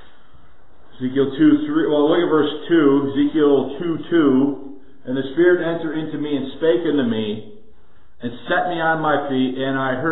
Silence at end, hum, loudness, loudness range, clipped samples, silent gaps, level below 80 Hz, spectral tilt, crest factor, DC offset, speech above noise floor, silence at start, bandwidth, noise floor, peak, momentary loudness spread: 0 s; none; -19 LUFS; 5 LU; under 0.1%; none; -56 dBFS; -11 dB/octave; 16 dB; 2%; 35 dB; 1 s; 4.1 kHz; -53 dBFS; -4 dBFS; 11 LU